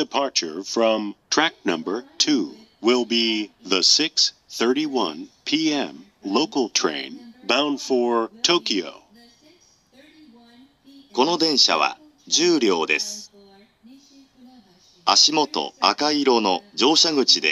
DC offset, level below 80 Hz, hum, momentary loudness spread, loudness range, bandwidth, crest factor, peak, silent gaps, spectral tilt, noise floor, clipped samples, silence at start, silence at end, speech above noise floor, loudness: under 0.1%; -74 dBFS; none; 11 LU; 4 LU; 12.5 kHz; 22 dB; 0 dBFS; none; -1.5 dB/octave; -56 dBFS; under 0.1%; 0 s; 0 s; 35 dB; -20 LUFS